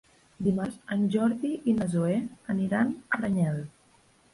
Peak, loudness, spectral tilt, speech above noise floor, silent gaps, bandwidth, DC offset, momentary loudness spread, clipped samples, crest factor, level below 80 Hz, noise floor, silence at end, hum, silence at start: -14 dBFS; -28 LUFS; -7.5 dB/octave; 35 dB; none; 11.5 kHz; under 0.1%; 6 LU; under 0.1%; 14 dB; -60 dBFS; -62 dBFS; 0.65 s; none; 0.4 s